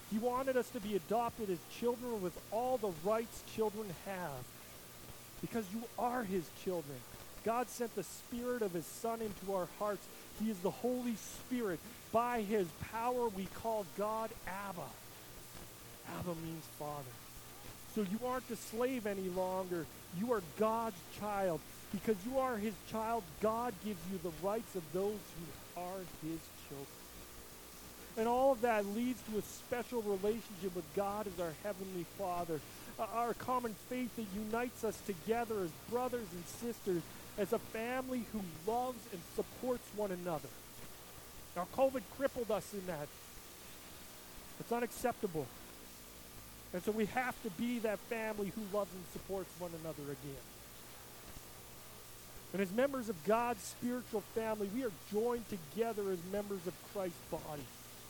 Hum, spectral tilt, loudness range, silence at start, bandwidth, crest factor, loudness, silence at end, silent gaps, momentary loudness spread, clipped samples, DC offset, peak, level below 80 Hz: none; -5 dB/octave; 5 LU; 0 s; 19 kHz; 20 dB; -40 LUFS; 0 s; none; 15 LU; under 0.1%; under 0.1%; -20 dBFS; -64 dBFS